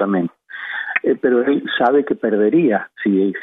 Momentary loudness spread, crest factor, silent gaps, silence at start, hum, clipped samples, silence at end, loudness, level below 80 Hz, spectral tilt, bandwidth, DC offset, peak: 10 LU; 14 dB; none; 0 s; none; under 0.1%; 0 s; -17 LUFS; -66 dBFS; -9 dB/octave; 4 kHz; under 0.1%; -4 dBFS